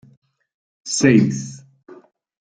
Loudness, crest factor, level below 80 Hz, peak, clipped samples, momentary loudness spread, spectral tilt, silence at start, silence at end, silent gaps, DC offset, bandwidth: -17 LUFS; 20 dB; -58 dBFS; -2 dBFS; under 0.1%; 21 LU; -5 dB/octave; 0.85 s; 0.45 s; none; under 0.1%; 9.6 kHz